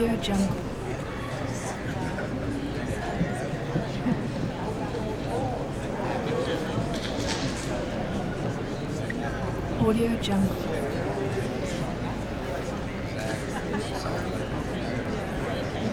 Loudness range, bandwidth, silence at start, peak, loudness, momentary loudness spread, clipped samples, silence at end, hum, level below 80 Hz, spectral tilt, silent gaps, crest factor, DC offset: 3 LU; 19 kHz; 0 s; -12 dBFS; -29 LUFS; 6 LU; under 0.1%; 0 s; none; -42 dBFS; -6 dB/octave; none; 16 dB; under 0.1%